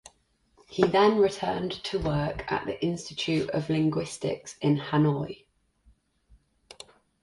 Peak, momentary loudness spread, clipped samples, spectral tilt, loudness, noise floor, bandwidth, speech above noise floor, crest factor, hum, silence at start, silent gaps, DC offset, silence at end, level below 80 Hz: -6 dBFS; 15 LU; under 0.1%; -6 dB/octave; -27 LUFS; -67 dBFS; 11.5 kHz; 40 dB; 22 dB; none; 0.7 s; none; under 0.1%; 1.9 s; -52 dBFS